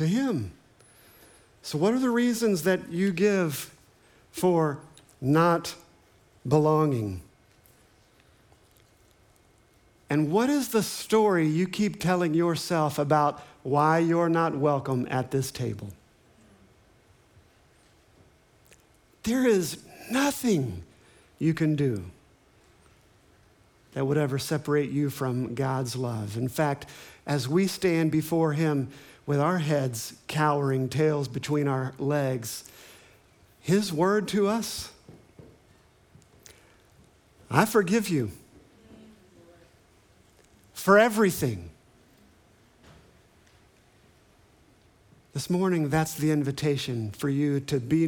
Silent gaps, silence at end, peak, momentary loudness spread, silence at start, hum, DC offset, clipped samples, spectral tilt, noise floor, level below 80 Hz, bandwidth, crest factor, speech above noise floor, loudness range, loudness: none; 0 s; -4 dBFS; 13 LU; 0 s; none; under 0.1%; under 0.1%; -6 dB/octave; -61 dBFS; -62 dBFS; 19.5 kHz; 24 dB; 35 dB; 7 LU; -26 LUFS